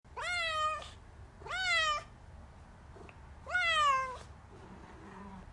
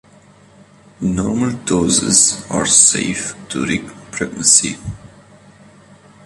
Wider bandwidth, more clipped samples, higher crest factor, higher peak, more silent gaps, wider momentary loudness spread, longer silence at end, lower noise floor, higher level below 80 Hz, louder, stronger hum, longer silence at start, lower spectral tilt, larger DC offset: second, 11.5 kHz vs 13.5 kHz; neither; about the same, 16 dB vs 18 dB; second, -20 dBFS vs 0 dBFS; neither; first, 25 LU vs 15 LU; second, 0 s vs 1.3 s; first, -54 dBFS vs -46 dBFS; second, -56 dBFS vs -44 dBFS; second, -32 LUFS vs -14 LUFS; neither; second, 0.05 s vs 1 s; about the same, -1.5 dB/octave vs -2.5 dB/octave; neither